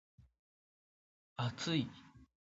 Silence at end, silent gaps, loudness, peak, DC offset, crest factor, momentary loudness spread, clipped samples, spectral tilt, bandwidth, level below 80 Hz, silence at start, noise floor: 0.2 s; none; -39 LUFS; -22 dBFS; under 0.1%; 22 dB; 17 LU; under 0.1%; -4.5 dB/octave; 7.6 kHz; -72 dBFS; 1.4 s; under -90 dBFS